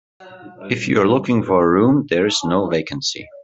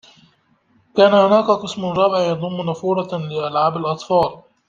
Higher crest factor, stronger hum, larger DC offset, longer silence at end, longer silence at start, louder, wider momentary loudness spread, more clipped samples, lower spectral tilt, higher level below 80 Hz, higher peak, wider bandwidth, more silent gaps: about the same, 16 dB vs 16 dB; neither; neither; second, 0 s vs 0.3 s; second, 0.2 s vs 0.95 s; about the same, -17 LUFS vs -18 LUFS; about the same, 9 LU vs 10 LU; neither; second, -5 dB/octave vs -6.5 dB/octave; about the same, -56 dBFS vs -58 dBFS; about the same, -2 dBFS vs -2 dBFS; about the same, 8.2 kHz vs 7.6 kHz; neither